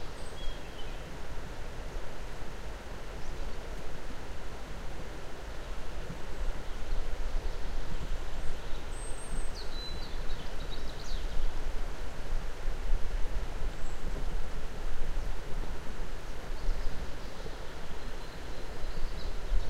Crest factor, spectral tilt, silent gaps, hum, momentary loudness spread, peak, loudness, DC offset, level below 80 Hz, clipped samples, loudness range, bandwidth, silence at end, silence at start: 16 dB; -4.5 dB/octave; none; none; 5 LU; -14 dBFS; -42 LUFS; under 0.1%; -34 dBFS; under 0.1%; 3 LU; 9.2 kHz; 0 s; 0 s